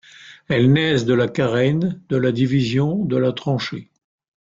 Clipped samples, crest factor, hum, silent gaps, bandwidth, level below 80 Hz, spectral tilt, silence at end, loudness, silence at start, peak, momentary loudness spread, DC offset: under 0.1%; 14 dB; none; none; 7.6 kHz; -54 dBFS; -7 dB/octave; 0.65 s; -19 LUFS; 0.2 s; -6 dBFS; 7 LU; under 0.1%